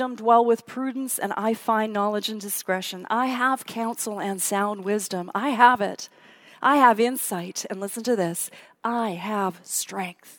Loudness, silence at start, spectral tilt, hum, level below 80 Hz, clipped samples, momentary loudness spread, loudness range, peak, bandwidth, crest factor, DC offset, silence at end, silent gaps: -24 LUFS; 0 s; -3.5 dB/octave; none; -80 dBFS; under 0.1%; 13 LU; 4 LU; -2 dBFS; 18 kHz; 24 dB; under 0.1%; 0.05 s; none